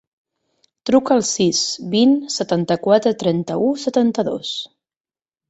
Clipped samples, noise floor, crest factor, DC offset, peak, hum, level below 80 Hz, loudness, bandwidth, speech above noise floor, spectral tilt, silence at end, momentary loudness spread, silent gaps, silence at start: under 0.1%; under -90 dBFS; 16 dB; under 0.1%; -2 dBFS; none; -60 dBFS; -18 LUFS; 8.2 kHz; over 73 dB; -4.5 dB/octave; 0.85 s; 9 LU; none; 0.85 s